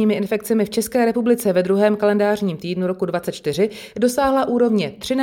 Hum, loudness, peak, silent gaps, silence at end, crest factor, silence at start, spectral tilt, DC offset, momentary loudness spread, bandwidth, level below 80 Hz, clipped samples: none; -19 LUFS; -4 dBFS; none; 0 s; 14 dB; 0 s; -5.5 dB/octave; under 0.1%; 6 LU; 18 kHz; -54 dBFS; under 0.1%